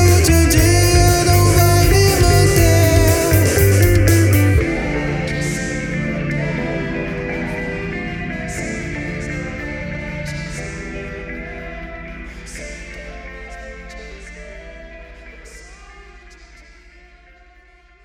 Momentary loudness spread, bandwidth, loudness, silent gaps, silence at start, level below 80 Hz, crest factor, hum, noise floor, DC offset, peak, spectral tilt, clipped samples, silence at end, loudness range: 21 LU; 19 kHz; -16 LUFS; none; 0 s; -26 dBFS; 16 dB; none; -48 dBFS; under 0.1%; 0 dBFS; -5 dB/octave; under 0.1%; 1.6 s; 22 LU